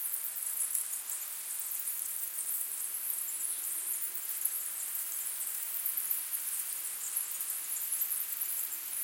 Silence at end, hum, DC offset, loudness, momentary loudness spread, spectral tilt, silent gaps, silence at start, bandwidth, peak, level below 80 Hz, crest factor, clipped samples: 0 s; none; under 0.1%; -33 LUFS; 3 LU; 3.5 dB/octave; none; 0 s; 17 kHz; -14 dBFS; under -90 dBFS; 22 dB; under 0.1%